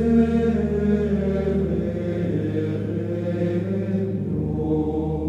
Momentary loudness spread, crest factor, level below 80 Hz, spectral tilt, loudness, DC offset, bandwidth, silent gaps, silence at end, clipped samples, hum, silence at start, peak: 5 LU; 14 dB; -36 dBFS; -10 dB/octave; -23 LUFS; under 0.1%; 7.8 kHz; none; 0 s; under 0.1%; none; 0 s; -8 dBFS